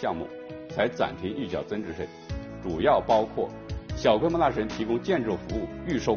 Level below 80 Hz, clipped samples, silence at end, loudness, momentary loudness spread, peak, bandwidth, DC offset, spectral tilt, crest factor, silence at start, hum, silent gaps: -46 dBFS; under 0.1%; 0 s; -28 LUFS; 14 LU; -8 dBFS; 7 kHz; under 0.1%; -5 dB/octave; 20 dB; 0 s; none; none